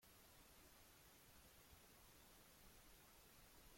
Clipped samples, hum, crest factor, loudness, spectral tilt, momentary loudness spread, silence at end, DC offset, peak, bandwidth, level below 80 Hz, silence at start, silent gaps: under 0.1%; none; 14 dB; -67 LUFS; -2.5 dB/octave; 0 LU; 0 s; under 0.1%; -54 dBFS; 16.5 kHz; -76 dBFS; 0 s; none